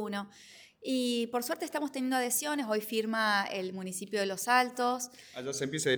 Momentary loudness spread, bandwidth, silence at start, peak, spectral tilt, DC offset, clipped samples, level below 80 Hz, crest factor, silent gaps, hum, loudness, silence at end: 12 LU; over 20 kHz; 0 s; -12 dBFS; -3 dB/octave; under 0.1%; under 0.1%; -80 dBFS; 20 dB; none; none; -32 LUFS; 0 s